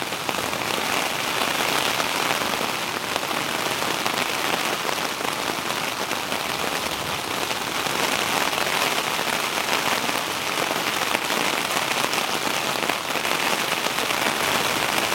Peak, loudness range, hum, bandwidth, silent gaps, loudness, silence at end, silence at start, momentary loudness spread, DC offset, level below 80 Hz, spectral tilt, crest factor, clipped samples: 0 dBFS; 2 LU; none; 17 kHz; none; -23 LUFS; 0 s; 0 s; 4 LU; under 0.1%; -58 dBFS; -1.5 dB/octave; 24 dB; under 0.1%